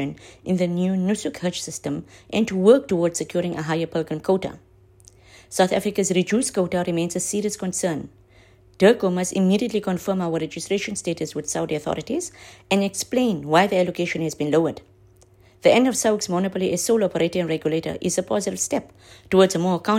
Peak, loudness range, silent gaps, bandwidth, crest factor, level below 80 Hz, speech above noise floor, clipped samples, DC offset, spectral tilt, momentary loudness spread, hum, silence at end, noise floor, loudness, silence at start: -2 dBFS; 3 LU; none; 16 kHz; 20 dB; -58 dBFS; 31 dB; under 0.1%; under 0.1%; -5 dB/octave; 10 LU; none; 0 s; -53 dBFS; -22 LUFS; 0 s